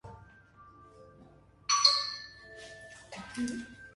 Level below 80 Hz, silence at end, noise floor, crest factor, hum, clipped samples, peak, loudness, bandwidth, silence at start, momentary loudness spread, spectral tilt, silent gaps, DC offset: -64 dBFS; 0.05 s; -58 dBFS; 28 dB; none; under 0.1%; -8 dBFS; -28 LUFS; 11.5 kHz; 0.05 s; 25 LU; -0.5 dB/octave; none; under 0.1%